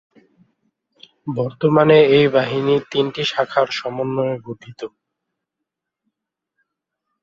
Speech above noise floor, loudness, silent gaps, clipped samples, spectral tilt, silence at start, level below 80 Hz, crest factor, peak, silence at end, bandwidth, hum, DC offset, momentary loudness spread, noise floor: 64 dB; -17 LUFS; none; under 0.1%; -6.5 dB/octave; 1.25 s; -62 dBFS; 18 dB; -2 dBFS; 2.35 s; 7.4 kHz; none; under 0.1%; 22 LU; -82 dBFS